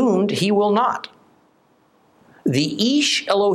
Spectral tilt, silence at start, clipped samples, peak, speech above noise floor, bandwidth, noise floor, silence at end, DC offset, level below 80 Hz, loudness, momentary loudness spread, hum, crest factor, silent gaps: -4.5 dB/octave; 0 s; under 0.1%; -4 dBFS; 40 dB; 14.5 kHz; -58 dBFS; 0 s; under 0.1%; -68 dBFS; -19 LUFS; 10 LU; none; 16 dB; none